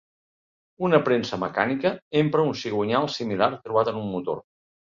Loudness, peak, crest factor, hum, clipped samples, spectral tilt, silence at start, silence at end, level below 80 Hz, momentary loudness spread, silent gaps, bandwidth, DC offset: -24 LUFS; -4 dBFS; 22 dB; none; under 0.1%; -6.5 dB/octave; 0.8 s; 0.55 s; -62 dBFS; 8 LU; 2.02-2.11 s; 7.6 kHz; under 0.1%